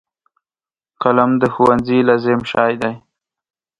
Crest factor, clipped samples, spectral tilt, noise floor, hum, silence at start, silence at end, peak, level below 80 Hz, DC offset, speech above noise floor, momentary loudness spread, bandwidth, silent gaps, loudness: 18 dB; under 0.1%; -7.5 dB/octave; under -90 dBFS; none; 1 s; 0.85 s; 0 dBFS; -50 dBFS; under 0.1%; over 76 dB; 8 LU; 9.2 kHz; none; -15 LUFS